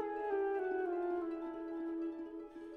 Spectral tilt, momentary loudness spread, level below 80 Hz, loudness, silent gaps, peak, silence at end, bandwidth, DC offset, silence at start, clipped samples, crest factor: -7 dB/octave; 9 LU; -72 dBFS; -40 LUFS; none; -26 dBFS; 0 s; 4.7 kHz; under 0.1%; 0 s; under 0.1%; 12 dB